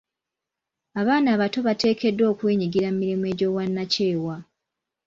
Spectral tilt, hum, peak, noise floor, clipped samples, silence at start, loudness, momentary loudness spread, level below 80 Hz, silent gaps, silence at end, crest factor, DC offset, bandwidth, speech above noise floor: -6.5 dB/octave; none; -8 dBFS; -86 dBFS; under 0.1%; 0.95 s; -23 LUFS; 7 LU; -62 dBFS; none; 0.65 s; 16 dB; under 0.1%; 7.6 kHz; 64 dB